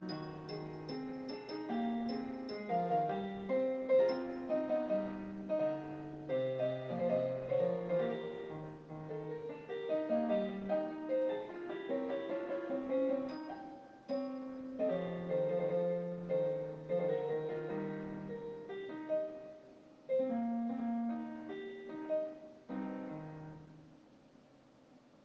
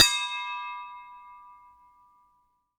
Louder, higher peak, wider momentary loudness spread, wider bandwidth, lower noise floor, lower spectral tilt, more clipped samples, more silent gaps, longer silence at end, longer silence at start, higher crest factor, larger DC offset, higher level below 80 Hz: second, -38 LUFS vs -28 LUFS; second, -22 dBFS vs -2 dBFS; second, 11 LU vs 24 LU; second, 6.6 kHz vs over 20 kHz; second, -63 dBFS vs -70 dBFS; first, -8.5 dB/octave vs 2 dB/octave; neither; neither; second, 0.3 s vs 1.25 s; about the same, 0 s vs 0 s; second, 16 dB vs 30 dB; neither; second, -72 dBFS vs -62 dBFS